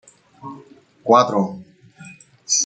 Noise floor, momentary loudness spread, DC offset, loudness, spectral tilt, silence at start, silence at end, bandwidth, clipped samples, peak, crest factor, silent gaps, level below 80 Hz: -47 dBFS; 26 LU; under 0.1%; -18 LUFS; -3 dB/octave; 0.45 s; 0 s; 9.4 kHz; under 0.1%; -2 dBFS; 20 dB; none; -70 dBFS